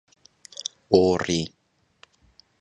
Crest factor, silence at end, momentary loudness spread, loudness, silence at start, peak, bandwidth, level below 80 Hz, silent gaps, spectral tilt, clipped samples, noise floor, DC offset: 24 dB; 1.15 s; 17 LU; -23 LUFS; 0.9 s; -2 dBFS; 10.5 kHz; -52 dBFS; none; -5 dB/octave; under 0.1%; -59 dBFS; under 0.1%